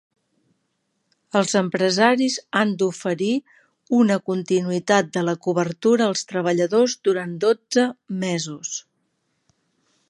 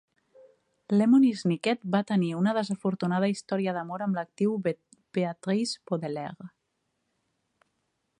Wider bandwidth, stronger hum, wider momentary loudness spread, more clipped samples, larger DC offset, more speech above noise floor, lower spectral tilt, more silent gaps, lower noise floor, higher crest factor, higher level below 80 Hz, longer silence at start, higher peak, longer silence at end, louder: about the same, 11.5 kHz vs 10.5 kHz; neither; second, 7 LU vs 12 LU; neither; neither; about the same, 52 dB vs 52 dB; second, -4.5 dB/octave vs -6.5 dB/octave; neither; second, -73 dBFS vs -78 dBFS; about the same, 20 dB vs 18 dB; about the same, -72 dBFS vs -76 dBFS; first, 1.35 s vs 0.9 s; first, -2 dBFS vs -10 dBFS; second, 1.3 s vs 1.7 s; first, -21 LUFS vs -28 LUFS